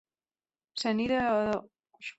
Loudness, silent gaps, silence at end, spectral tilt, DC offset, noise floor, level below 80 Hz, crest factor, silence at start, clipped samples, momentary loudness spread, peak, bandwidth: -29 LUFS; none; 0.05 s; -5 dB/octave; under 0.1%; under -90 dBFS; -62 dBFS; 14 dB; 0.75 s; under 0.1%; 13 LU; -18 dBFS; 8.2 kHz